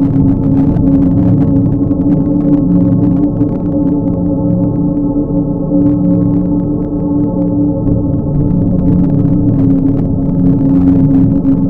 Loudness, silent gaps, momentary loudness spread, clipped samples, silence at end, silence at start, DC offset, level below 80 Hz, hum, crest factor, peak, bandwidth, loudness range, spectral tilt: -11 LUFS; none; 4 LU; under 0.1%; 0 s; 0 s; under 0.1%; -24 dBFS; none; 10 dB; 0 dBFS; 2.4 kHz; 2 LU; -13.5 dB/octave